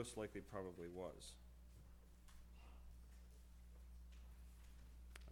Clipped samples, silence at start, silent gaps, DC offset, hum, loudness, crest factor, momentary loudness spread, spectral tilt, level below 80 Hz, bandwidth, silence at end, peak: under 0.1%; 0 s; none; under 0.1%; none; -58 LUFS; 22 dB; 14 LU; -5 dB/octave; -62 dBFS; 19 kHz; 0 s; -34 dBFS